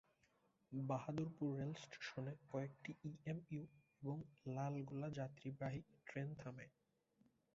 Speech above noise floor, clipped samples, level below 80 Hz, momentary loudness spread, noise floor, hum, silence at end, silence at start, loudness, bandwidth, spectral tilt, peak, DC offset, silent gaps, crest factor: 32 dB; under 0.1%; -80 dBFS; 8 LU; -80 dBFS; none; 0.85 s; 0.7 s; -49 LUFS; 7.6 kHz; -7 dB/octave; -30 dBFS; under 0.1%; none; 18 dB